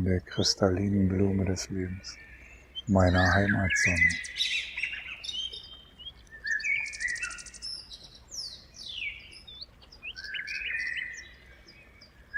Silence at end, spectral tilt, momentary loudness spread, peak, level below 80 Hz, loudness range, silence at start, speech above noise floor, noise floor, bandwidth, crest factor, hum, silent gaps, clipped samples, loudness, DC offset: 0 s; -4.5 dB/octave; 20 LU; -8 dBFS; -50 dBFS; 11 LU; 0 s; 28 dB; -55 dBFS; 12.5 kHz; 22 dB; none; none; under 0.1%; -29 LUFS; under 0.1%